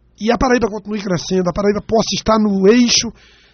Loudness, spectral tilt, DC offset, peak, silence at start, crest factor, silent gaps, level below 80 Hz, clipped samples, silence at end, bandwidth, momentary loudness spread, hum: -15 LUFS; -4 dB/octave; under 0.1%; -2 dBFS; 0.2 s; 14 dB; none; -36 dBFS; under 0.1%; 0.45 s; 6.8 kHz; 9 LU; none